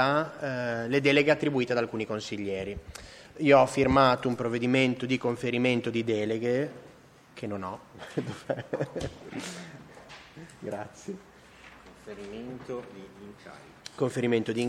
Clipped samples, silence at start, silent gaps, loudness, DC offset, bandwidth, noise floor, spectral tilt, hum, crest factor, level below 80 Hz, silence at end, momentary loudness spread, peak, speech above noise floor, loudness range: under 0.1%; 0 s; none; -28 LUFS; under 0.1%; 14 kHz; -52 dBFS; -6 dB/octave; none; 22 dB; -56 dBFS; 0 s; 24 LU; -6 dBFS; 24 dB; 17 LU